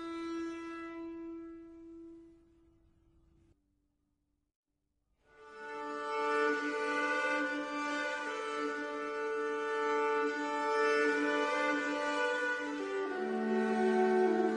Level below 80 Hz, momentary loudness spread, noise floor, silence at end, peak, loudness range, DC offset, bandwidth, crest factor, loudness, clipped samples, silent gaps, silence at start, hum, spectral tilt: -74 dBFS; 16 LU; -82 dBFS; 0 s; -20 dBFS; 17 LU; under 0.1%; 10.5 kHz; 16 dB; -34 LUFS; under 0.1%; 4.56-4.63 s; 0 s; none; -4 dB/octave